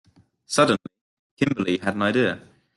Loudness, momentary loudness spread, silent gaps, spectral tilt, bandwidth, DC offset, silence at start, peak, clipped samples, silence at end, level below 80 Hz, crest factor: -23 LUFS; 7 LU; 1.01-1.37 s; -5 dB/octave; 12.5 kHz; under 0.1%; 0.5 s; -4 dBFS; under 0.1%; 0.35 s; -62 dBFS; 20 dB